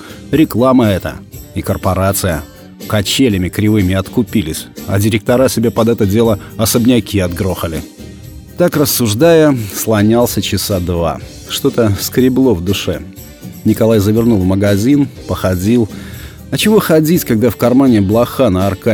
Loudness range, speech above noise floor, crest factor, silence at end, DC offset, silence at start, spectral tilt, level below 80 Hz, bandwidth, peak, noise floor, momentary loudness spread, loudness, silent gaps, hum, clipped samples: 2 LU; 20 dB; 12 dB; 0 s; under 0.1%; 0 s; -5.5 dB/octave; -36 dBFS; over 20 kHz; 0 dBFS; -31 dBFS; 13 LU; -13 LUFS; none; none; under 0.1%